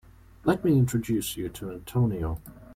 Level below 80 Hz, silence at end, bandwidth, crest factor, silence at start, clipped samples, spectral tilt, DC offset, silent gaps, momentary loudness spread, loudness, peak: -46 dBFS; 0 s; 16 kHz; 16 dB; 0.45 s; under 0.1%; -6.5 dB/octave; under 0.1%; none; 12 LU; -27 LUFS; -10 dBFS